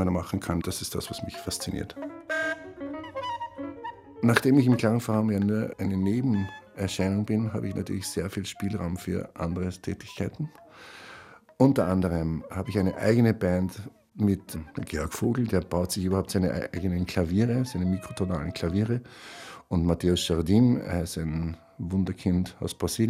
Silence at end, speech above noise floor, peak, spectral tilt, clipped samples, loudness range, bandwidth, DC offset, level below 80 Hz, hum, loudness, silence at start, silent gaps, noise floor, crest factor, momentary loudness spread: 0 s; 22 dB; -4 dBFS; -6 dB/octave; under 0.1%; 7 LU; 16 kHz; under 0.1%; -52 dBFS; none; -28 LUFS; 0 s; none; -49 dBFS; 24 dB; 15 LU